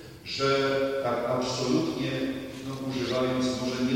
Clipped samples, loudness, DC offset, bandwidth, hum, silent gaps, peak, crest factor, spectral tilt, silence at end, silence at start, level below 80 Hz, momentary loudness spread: under 0.1%; -28 LUFS; under 0.1%; 16.5 kHz; none; none; -12 dBFS; 16 dB; -5 dB/octave; 0 s; 0 s; -56 dBFS; 9 LU